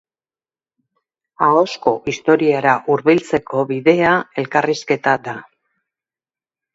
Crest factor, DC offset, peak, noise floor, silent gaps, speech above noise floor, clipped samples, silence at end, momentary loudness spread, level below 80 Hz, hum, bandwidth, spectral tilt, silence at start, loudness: 18 dB; under 0.1%; 0 dBFS; under -90 dBFS; none; over 74 dB; under 0.1%; 1.35 s; 6 LU; -58 dBFS; none; 7.8 kHz; -6 dB/octave; 1.4 s; -16 LUFS